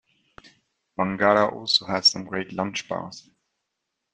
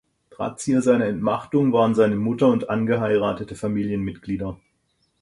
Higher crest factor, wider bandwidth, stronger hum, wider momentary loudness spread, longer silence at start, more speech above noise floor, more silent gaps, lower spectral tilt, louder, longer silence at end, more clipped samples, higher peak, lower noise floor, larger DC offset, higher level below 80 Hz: first, 22 dB vs 16 dB; second, 9.8 kHz vs 11.5 kHz; neither; first, 13 LU vs 10 LU; first, 1 s vs 0.4 s; first, 57 dB vs 48 dB; neither; second, -3.5 dB/octave vs -7 dB/octave; about the same, -23 LUFS vs -22 LUFS; first, 0.95 s vs 0.65 s; neither; about the same, -4 dBFS vs -6 dBFS; first, -81 dBFS vs -69 dBFS; neither; second, -64 dBFS vs -52 dBFS